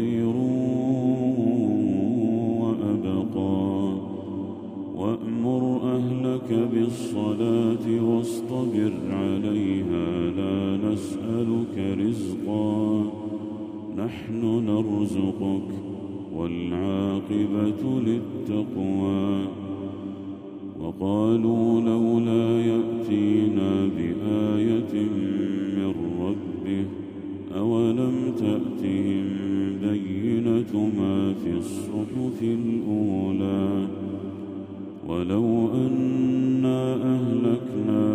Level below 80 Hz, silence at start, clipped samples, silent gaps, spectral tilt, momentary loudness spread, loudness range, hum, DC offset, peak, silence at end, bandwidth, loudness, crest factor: -60 dBFS; 0 s; under 0.1%; none; -8 dB/octave; 10 LU; 4 LU; none; under 0.1%; -10 dBFS; 0 s; 12.5 kHz; -25 LUFS; 14 dB